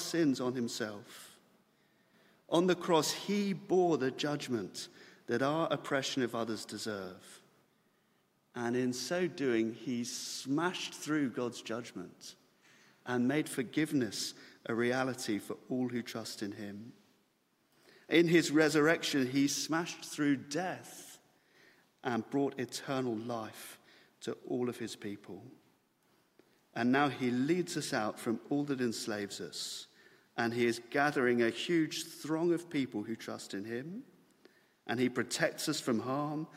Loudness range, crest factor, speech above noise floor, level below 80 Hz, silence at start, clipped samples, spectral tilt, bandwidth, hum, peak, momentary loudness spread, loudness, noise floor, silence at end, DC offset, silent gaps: 7 LU; 20 dB; 41 dB; -80 dBFS; 0 s; under 0.1%; -4.5 dB/octave; 16 kHz; none; -14 dBFS; 16 LU; -34 LUFS; -75 dBFS; 0 s; under 0.1%; none